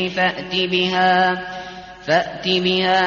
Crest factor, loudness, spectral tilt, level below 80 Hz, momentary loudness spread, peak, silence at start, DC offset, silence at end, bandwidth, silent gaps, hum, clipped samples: 14 dB; -18 LUFS; -2 dB/octave; -54 dBFS; 15 LU; -4 dBFS; 0 s; under 0.1%; 0 s; 7.2 kHz; none; none; under 0.1%